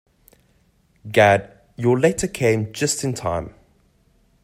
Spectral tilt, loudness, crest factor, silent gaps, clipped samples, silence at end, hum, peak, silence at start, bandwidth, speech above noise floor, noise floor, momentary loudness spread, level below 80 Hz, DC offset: -5 dB/octave; -20 LUFS; 20 dB; none; under 0.1%; 0.95 s; none; -2 dBFS; 1.05 s; 16 kHz; 41 dB; -60 dBFS; 12 LU; -50 dBFS; under 0.1%